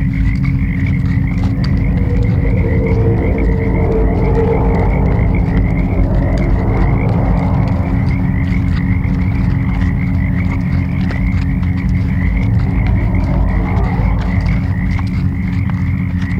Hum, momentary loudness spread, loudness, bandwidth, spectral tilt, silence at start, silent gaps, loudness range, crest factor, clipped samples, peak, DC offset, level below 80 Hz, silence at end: none; 2 LU; -15 LUFS; 6 kHz; -9.5 dB/octave; 0 s; none; 2 LU; 12 dB; under 0.1%; -2 dBFS; under 0.1%; -18 dBFS; 0 s